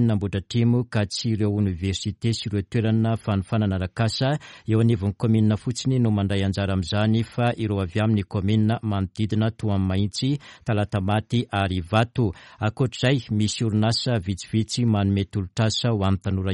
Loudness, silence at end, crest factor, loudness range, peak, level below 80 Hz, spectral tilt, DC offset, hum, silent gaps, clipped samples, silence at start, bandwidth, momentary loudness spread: -24 LUFS; 0 s; 16 dB; 2 LU; -6 dBFS; -50 dBFS; -6.5 dB/octave; under 0.1%; none; none; under 0.1%; 0 s; 11 kHz; 5 LU